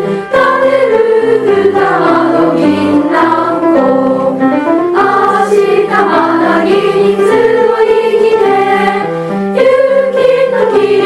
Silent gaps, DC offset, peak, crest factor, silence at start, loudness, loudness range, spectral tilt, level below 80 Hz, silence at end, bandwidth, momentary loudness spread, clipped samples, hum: none; under 0.1%; 0 dBFS; 8 dB; 0 s; -9 LUFS; 1 LU; -6.5 dB/octave; -48 dBFS; 0 s; 12 kHz; 2 LU; under 0.1%; none